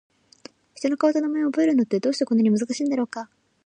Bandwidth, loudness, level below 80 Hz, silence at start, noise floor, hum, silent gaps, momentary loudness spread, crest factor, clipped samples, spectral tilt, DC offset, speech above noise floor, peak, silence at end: 9.8 kHz; -23 LUFS; -76 dBFS; 0.8 s; -49 dBFS; none; none; 9 LU; 14 dB; under 0.1%; -5.5 dB/octave; under 0.1%; 27 dB; -8 dBFS; 0.4 s